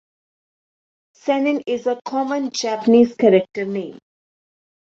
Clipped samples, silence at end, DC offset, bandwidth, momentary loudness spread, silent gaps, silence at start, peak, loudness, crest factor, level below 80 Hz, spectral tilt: under 0.1%; 0.9 s; under 0.1%; 7.8 kHz; 12 LU; none; 1.25 s; -2 dBFS; -19 LUFS; 18 dB; -66 dBFS; -5 dB/octave